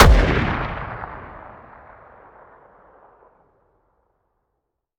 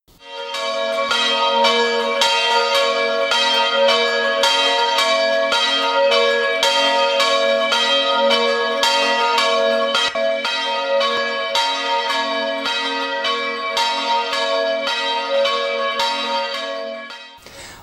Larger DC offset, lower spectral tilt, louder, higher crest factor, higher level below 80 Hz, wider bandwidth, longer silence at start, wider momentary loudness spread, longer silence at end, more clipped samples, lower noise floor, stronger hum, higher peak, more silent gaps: neither; first, -5.5 dB/octave vs 0 dB/octave; second, -21 LUFS vs -17 LUFS; about the same, 22 dB vs 18 dB; first, -26 dBFS vs -64 dBFS; about the same, 16 kHz vs 15 kHz; second, 0 s vs 0.2 s; first, 28 LU vs 6 LU; first, 3.5 s vs 0 s; neither; first, -77 dBFS vs -38 dBFS; neither; about the same, 0 dBFS vs 0 dBFS; neither